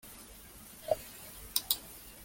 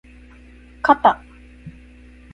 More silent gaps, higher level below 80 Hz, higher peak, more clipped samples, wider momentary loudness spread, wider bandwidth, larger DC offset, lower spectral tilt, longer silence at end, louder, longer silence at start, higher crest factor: neither; second, -60 dBFS vs -46 dBFS; second, -10 dBFS vs 0 dBFS; neither; second, 18 LU vs 27 LU; first, 17 kHz vs 9.8 kHz; neither; second, -1 dB/octave vs -6 dB/octave; second, 0 s vs 0.65 s; second, -36 LUFS vs -18 LUFS; second, 0.05 s vs 0.85 s; first, 30 dB vs 22 dB